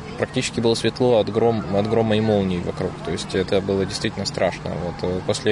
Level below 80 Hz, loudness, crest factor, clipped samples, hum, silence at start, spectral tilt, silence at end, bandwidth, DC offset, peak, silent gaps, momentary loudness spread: -46 dBFS; -22 LUFS; 16 dB; under 0.1%; none; 0 s; -5.5 dB/octave; 0 s; 11 kHz; under 0.1%; -6 dBFS; none; 8 LU